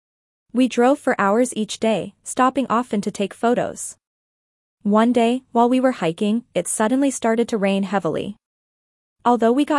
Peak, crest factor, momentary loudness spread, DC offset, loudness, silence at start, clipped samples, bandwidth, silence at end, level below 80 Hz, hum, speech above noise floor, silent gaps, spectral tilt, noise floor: -4 dBFS; 16 dB; 9 LU; under 0.1%; -20 LUFS; 0.55 s; under 0.1%; 12 kHz; 0 s; -64 dBFS; none; over 71 dB; 4.07-4.78 s, 8.46-9.16 s; -5 dB/octave; under -90 dBFS